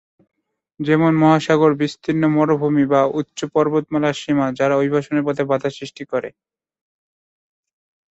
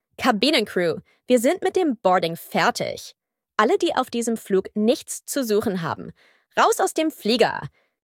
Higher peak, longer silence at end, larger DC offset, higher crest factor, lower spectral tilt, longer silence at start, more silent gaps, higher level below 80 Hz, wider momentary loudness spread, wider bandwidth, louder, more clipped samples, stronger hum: about the same, -2 dBFS vs -2 dBFS; first, 1.85 s vs 0.35 s; neither; about the same, 18 dB vs 20 dB; first, -7 dB/octave vs -4 dB/octave; first, 0.8 s vs 0.2 s; neither; about the same, -60 dBFS vs -64 dBFS; about the same, 11 LU vs 11 LU; second, 8 kHz vs 17.5 kHz; first, -18 LUFS vs -22 LUFS; neither; neither